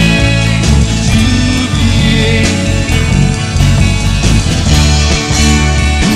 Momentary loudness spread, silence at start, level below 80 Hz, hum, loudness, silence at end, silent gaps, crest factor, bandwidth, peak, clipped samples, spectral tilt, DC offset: 3 LU; 0 s; -14 dBFS; none; -10 LUFS; 0 s; none; 10 dB; 14.5 kHz; 0 dBFS; 0.2%; -4.5 dB/octave; 0.5%